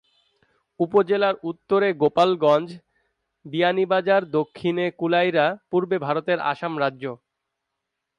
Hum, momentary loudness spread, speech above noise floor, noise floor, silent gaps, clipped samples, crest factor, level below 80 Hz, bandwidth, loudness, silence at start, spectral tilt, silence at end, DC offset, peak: none; 7 LU; 60 dB; -81 dBFS; none; under 0.1%; 16 dB; -70 dBFS; 9.6 kHz; -22 LUFS; 0.8 s; -7 dB/octave; 1.05 s; under 0.1%; -6 dBFS